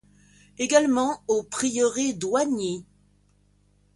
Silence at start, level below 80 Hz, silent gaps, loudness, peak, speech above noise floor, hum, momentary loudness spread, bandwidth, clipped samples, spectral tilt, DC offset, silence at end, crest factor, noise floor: 0.6 s; -62 dBFS; none; -24 LUFS; -6 dBFS; 39 dB; 50 Hz at -55 dBFS; 10 LU; 11.5 kHz; under 0.1%; -3.5 dB/octave; under 0.1%; 1.15 s; 20 dB; -62 dBFS